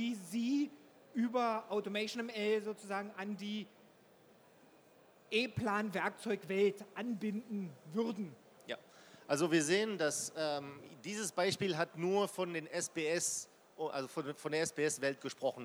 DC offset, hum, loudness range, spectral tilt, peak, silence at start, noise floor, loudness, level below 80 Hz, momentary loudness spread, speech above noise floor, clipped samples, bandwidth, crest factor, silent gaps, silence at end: under 0.1%; none; 5 LU; -4 dB/octave; -18 dBFS; 0 s; -65 dBFS; -37 LUFS; -80 dBFS; 10 LU; 27 dB; under 0.1%; over 20 kHz; 20 dB; none; 0 s